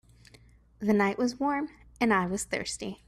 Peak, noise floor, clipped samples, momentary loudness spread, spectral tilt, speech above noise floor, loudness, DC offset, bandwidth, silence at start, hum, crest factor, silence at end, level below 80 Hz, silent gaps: -12 dBFS; -57 dBFS; under 0.1%; 8 LU; -4.5 dB/octave; 29 dB; -29 LUFS; under 0.1%; 13.5 kHz; 0.8 s; none; 18 dB; 0.15 s; -58 dBFS; none